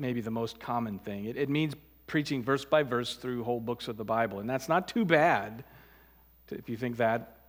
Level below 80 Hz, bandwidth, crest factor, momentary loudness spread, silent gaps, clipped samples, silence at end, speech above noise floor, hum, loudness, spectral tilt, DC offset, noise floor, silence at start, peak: -64 dBFS; 18 kHz; 24 dB; 11 LU; none; under 0.1%; 0.2 s; 29 dB; none; -31 LUFS; -6 dB/octave; under 0.1%; -60 dBFS; 0 s; -8 dBFS